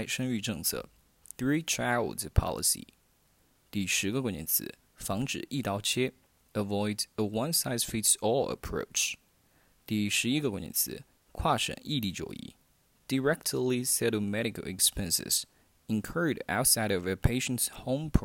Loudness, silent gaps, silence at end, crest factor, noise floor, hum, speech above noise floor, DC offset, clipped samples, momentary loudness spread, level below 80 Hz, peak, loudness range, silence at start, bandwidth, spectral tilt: -30 LUFS; none; 0 s; 26 dB; -68 dBFS; none; 37 dB; under 0.1%; under 0.1%; 10 LU; -46 dBFS; -6 dBFS; 3 LU; 0 s; 16.5 kHz; -3.5 dB/octave